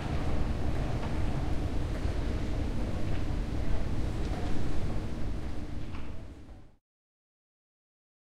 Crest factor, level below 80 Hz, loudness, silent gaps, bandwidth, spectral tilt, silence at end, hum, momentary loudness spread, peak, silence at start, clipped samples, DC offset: 14 dB; -36 dBFS; -35 LUFS; none; 10 kHz; -7 dB/octave; 1.55 s; none; 9 LU; -16 dBFS; 0 s; under 0.1%; under 0.1%